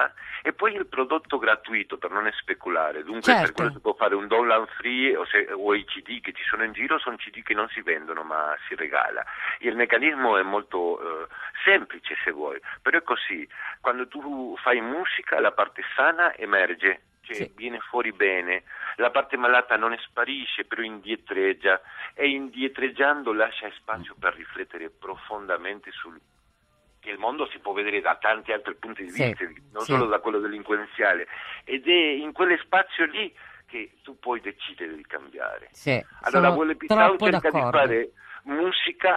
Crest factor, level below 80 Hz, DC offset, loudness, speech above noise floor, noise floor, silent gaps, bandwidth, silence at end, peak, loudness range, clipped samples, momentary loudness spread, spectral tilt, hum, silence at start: 24 dB; -64 dBFS; under 0.1%; -24 LUFS; 39 dB; -65 dBFS; none; 12.5 kHz; 0 s; -2 dBFS; 6 LU; under 0.1%; 14 LU; -5 dB/octave; none; 0 s